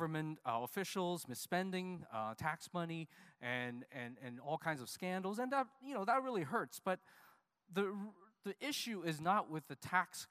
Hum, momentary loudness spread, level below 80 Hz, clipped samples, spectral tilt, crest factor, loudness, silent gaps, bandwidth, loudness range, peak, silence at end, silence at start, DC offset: none; 11 LU; -82 dBFS; under 0.1%; -4.5 dB/octave; 22 dB; -41 LUFS; none; 15.5 kHz; 3 LU; -20 dBFS; 0.05 s; 0 s; under 0.1%